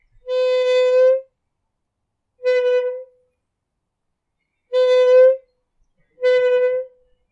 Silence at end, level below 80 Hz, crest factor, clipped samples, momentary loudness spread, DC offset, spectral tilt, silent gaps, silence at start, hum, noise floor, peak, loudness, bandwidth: 0.45 s; -68 dBFS; 14 dB; under 0.1%; 14 LU; under 0.1%; -0.5 dB/octave; none; 0.25 s; none; -77 dBFS; -4 dBFS; -17 LUFS; 7.6 kHz